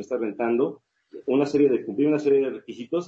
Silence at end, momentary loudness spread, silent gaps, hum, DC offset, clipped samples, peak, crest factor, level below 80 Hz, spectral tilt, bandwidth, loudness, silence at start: 0 s; 9 LU; none; none; under 0.1%; under 0.1%; -10 dBFS; 14 dB; -72 dBFS; -7.5 dB/octave; 7.8 kHz; -23 LUFS; 0 s